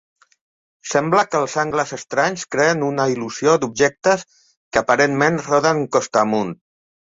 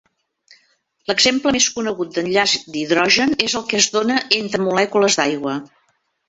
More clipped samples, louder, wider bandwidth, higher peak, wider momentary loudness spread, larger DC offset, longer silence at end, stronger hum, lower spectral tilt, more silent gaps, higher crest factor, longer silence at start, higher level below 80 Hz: neither; about the same, -18 LUFS vs -17 LUFS; about the same, 8 kHz vs 8.4 kHz; about the same, -2 dBFS vs 0 dBFS; about the same, 6 LU vs 8 LU; neither; about the same, 0.65 s vs 0.65 s; neither; first, -4.5 dB/octave vs -2 dB/octave; first, 4.57-4.71 s vs none; about the same, 18 dB vs 18 dB; second, 0.85 s vs 1.1 s; about the same, -58 dBFS vs -56 dBFS